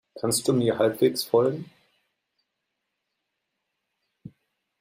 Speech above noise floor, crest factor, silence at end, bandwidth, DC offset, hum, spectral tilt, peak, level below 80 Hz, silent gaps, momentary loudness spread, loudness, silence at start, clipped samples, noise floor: 58 dB; 20 dB; 0.5 s; 16 kHz; under 0.1%; none; -4.5 dB/octave; -8 dBFS; -68 dBFS; none; 5 LU; -24 LUFS; 0.15 s; under 0.1%; -81 dBFS